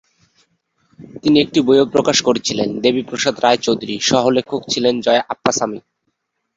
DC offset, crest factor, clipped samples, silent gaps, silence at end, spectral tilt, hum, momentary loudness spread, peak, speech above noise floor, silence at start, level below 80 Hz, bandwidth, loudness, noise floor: under 0.1%; 16 dB; under 0.1%; none; 0.8 s; -3.5 dB/octave; none; 6 LU; -2 dBFS; 55 dB; 1 s; -54 dBFS; 8 kHz; -16 LUFS; -71 dBFS